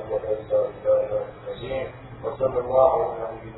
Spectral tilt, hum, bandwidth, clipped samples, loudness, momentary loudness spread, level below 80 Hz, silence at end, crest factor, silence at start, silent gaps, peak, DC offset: -10.5 dB/octave; none; 4.1 kHz; under 0.1%; -24 LUFS; 15 LU; -50 dBFS; 0 s; 20 dB; 0 s; none; -4 dBFS; under 0.1%